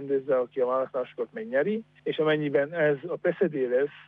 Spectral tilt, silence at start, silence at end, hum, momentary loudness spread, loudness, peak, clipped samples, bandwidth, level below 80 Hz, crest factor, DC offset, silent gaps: -9 dB/octave; 0 s; 0.05 s; none; 7 LU; -27 LUFS; -12 dBFS; under 0.1%; 4.2 kHz; -76 dBFS; 14 dB; under 0.1%; none